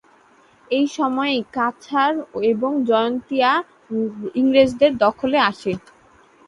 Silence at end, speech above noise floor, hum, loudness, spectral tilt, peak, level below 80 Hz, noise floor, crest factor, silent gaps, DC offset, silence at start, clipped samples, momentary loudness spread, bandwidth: 0.7 s; 34 dB; none; -20 LUFS; -5 dB/octave; -2 dBFS; -58 dBFS; -53 dBFS; 18 dB; none; under 0.1%; 0.7 s; under 0.1%; 9 LU; 11 kHz